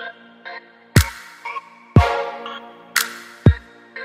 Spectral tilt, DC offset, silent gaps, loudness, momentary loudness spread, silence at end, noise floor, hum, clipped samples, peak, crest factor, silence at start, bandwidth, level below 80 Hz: -5 dB/octave; under 0.1%; none; -20 LUFS; 19 LU; 0 s; -38 dBFS; none; under 0.1%; 0 dBFS; 20 dB; 0 s; 16 kHz; -32 dBFS